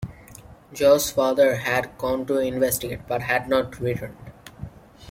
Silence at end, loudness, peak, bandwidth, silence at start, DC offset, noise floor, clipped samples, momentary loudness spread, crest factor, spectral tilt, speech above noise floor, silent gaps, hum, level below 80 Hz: 0 s; -22 LUFS; -6 dBFS; 16.5 kHz; 0 s; under 0.1%; -46 dBFS; under 0.1%; 22 LU; 18 dB; -4.5 dB/octave; 24 dB; none; none; -50 dBFS